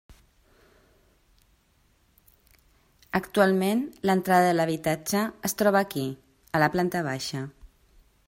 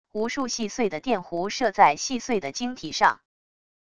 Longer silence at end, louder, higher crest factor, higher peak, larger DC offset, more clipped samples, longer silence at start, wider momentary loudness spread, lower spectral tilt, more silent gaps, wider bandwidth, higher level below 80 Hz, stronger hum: about the same, 0.6 s vs 0.7 s; about the same, -25 LUFS vs -25 LUFS; about the same, 22 dB vs 22 dB; about the same, -6 dBFS vs -4 dBFS; second, under 0.1% vs 0.5%; neither; first, 3.15 s vs 0.05 s; about the same, 11 LU vs 10 LU; first, -5 dB/octave vs -3 dB/octave; neither; first, 16 kHz vs 11 kHz; about the same, -60 dBFS vs -60 dBFS; neither